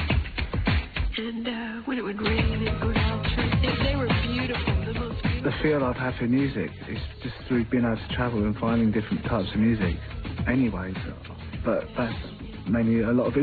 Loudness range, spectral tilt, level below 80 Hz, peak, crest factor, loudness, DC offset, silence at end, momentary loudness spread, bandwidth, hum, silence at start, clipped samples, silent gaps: 2 LU; -9.5 dB/octave; -34 dBFS; -8 dBFS; 16 dB; -26 LUFS; under 0.1%; 0 s; 10 LU; 4.8 kHz; none; 0 s; under 0.1%; none